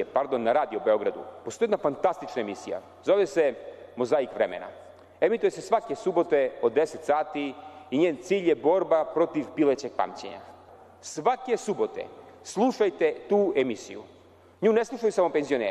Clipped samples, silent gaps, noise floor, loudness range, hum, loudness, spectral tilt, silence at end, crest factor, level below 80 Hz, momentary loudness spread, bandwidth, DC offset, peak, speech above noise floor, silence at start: under 0.1%; none; -51 dBFS; 3 LU; none; -26 LUFS; -5 dB/octave; 0 s; 14 dB; -70 dBFS; 15 LU; 12 kHz; under 0.1%; -12 dBFS; 25 dB; 0 s